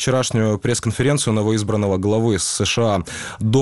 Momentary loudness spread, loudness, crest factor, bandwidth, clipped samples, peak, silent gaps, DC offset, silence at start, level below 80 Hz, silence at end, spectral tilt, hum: 3 LU; -19 LUFS; 14 dB; 12 kHz; under 0.1%; -6 dBFS; none; 0.4%; 0 s; -46 dBFS; 0 s; -5 dB/octave; none